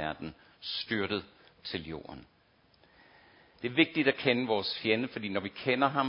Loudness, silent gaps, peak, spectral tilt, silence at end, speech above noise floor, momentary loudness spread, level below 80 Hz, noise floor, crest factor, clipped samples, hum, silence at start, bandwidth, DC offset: -31 LUFS; none; -8 dBFS; -9 dB/octave; 0 s; 34 dB; 17 LU; -64 dBFS; -65 dBFS; 24 dB; under 0.1%; none; 0 s; 5.6 kHz; under 0.1%